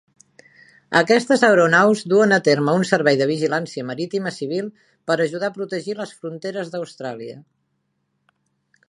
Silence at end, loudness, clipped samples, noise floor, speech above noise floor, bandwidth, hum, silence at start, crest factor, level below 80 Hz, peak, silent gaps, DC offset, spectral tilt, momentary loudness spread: 1.45 s; -19 LUFS; under 0.1%; -71 dBFS; 52 dB; 11.5 kHz; none; 0.9 s; 20 dB; -70 dBFS; 0 dBFS; none; under 0.1%; -5 dB/octave; 16 LU